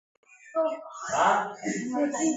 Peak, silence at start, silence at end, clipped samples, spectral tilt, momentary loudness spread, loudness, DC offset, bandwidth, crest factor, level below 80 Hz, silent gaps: -10 dBFS; 0.45 s; 0 s; under 0.1%; -3.5 dB/octave; 9 LU; -28 LUFS; under 0.1%; 8.2 kHz; 18 dB; -70 dBFS; none